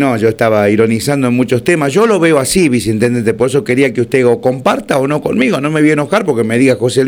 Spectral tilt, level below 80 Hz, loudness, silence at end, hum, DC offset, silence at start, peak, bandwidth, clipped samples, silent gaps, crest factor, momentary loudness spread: -5.5 dB/octave; -44 dBFS; -12 LUFS; 0 s; none; 0.1%; 0 s; 0 dBFS; 19 kHz; under 0.1%; none; 12 dB; 3 LU